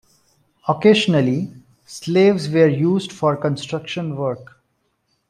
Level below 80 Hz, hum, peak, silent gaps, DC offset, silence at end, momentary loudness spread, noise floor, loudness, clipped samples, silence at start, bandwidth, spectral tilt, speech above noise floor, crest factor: -62 dBFS; none; -2 dBFS; none; under 0.1%; 0.85 s; 14 LU; -68 dBFS; -18 LUFS; under 0.1%; 0.65 s; 12 kHz; -6.5 dB/octave; 51 dB; 18 dB